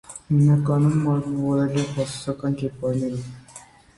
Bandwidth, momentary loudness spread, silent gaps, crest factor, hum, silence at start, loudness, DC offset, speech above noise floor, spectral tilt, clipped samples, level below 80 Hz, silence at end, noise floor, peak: 11.5 kHz; 11 LU; none; 14 dB; none; 0.1 s; -22 LUFS; under 0.1%; 25 dB; -7.5 dB/octave; under 0.1%; -54 dBFS; 0.35 s; -47 dBFS; -8 dBFS